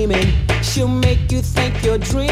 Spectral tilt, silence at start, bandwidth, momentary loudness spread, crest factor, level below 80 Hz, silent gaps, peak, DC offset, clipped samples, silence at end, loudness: -5.5 dB/octave; 0 s; 16 kHz; 3 LU; 16 dB; -22 dBFS; none; 0 dBFS; under 0.1%; under 0.1%; 0 s; -17 LUFS